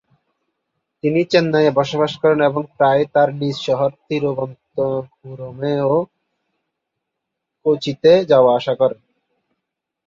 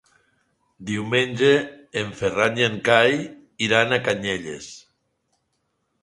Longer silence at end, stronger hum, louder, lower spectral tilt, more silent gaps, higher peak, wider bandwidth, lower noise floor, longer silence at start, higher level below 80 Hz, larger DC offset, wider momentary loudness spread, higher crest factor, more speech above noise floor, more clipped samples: about the same, 1.15 s vs 1.25 s; neither; first, -17 LUFS vs -21 LUFS; first, -6.5 dB/octave vs -4.5 dB/octave; neither; about the same, -2 dBFS vs 0 dBFS; second, 7.6 kHz vs 11.5 kHz; first, -80 dBFS vs -73 dBFS; first, 1.05 s vs 0.8 s; about the same, -60 dBFS vs -58 dBFS; neither; second, 13 LU vs 17 LU; about the same, 18 dB vs 22 dB; first, 63 dB vs 52 dB; neither